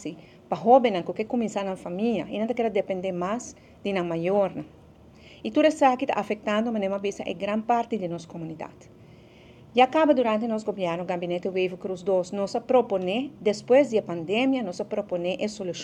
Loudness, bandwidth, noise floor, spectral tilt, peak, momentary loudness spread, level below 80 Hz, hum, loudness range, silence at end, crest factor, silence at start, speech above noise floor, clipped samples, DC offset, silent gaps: -25 LUFS; 10 kHz; -51 dBFS; -5.5 dB/octave; -4 dBFS; 13 LU; -64 dBFS; none; 4 LU; 0 s; 22 dB; 0 s; 25 dB; under 0.1%; under 0.1%; none